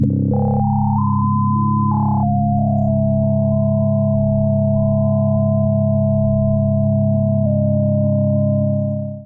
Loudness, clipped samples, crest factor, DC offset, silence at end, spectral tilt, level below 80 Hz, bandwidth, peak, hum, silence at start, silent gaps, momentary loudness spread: -17 LUFS; under 0.1%; 12 dB; under 0.1%; 0 s; -16.5 dB/octave; -38 dBFS; 1.4 kHz; -4 dBFS; none; 0 s; none; 1 LU